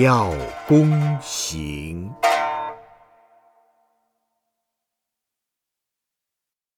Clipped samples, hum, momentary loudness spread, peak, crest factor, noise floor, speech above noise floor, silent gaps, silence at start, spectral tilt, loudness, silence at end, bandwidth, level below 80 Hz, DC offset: under 0.1%; none; 15 LU; -4 dBFS; 20 dB; -87 dBFS; 67 dB; none; 0 s; -5.5 dB/octave; -21 LUFS; 3.95 s; 16 kHz; -46 dBFS; under 0.1%